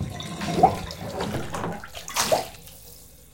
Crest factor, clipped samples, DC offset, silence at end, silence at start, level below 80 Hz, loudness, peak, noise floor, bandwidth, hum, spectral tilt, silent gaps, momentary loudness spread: 24 dB; under 0.1%; under 0.1%; 0.1 s; 0 s; -48 dBFS; -26 LUFS; -4 dBFS; -47 dBFS; 17 kHz; none; -4 dB/octave; none; 22 LU